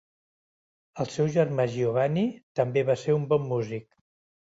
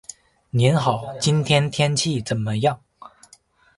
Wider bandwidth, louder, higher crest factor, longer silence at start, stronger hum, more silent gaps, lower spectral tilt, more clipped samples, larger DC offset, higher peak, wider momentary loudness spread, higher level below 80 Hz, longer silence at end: second, 8 kHz vs 11.5 kHz; second, -27 LUFS vs -21 LUFS; about the same, 18 dB vs 20 dB; first, 0.95 s vs 0.55 s; neither; first, 2.43-2.55 s vs none; first, -7.5 dB/octave vs -5 dB/octave; neither; neither; second, -10 dBFS vs -2 dBFS; about the same, 8 LU vs 7 LU; second, -66 dBFS vs -54 dBFS; about the same, 0.6 s vs 0.7 s